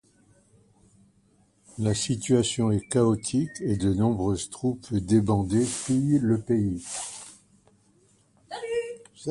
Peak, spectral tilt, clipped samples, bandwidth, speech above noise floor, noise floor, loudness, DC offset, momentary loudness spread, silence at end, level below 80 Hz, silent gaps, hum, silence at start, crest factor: -10 dBFS; -6 dB/octave; under 0.1%; 11.5 kHz; 39 dB; -63 dBFS; -26 LUFS; under 0.1%; 14 LU; 0 s; -50 dBFS; none; none; 1.75 s; 18 dB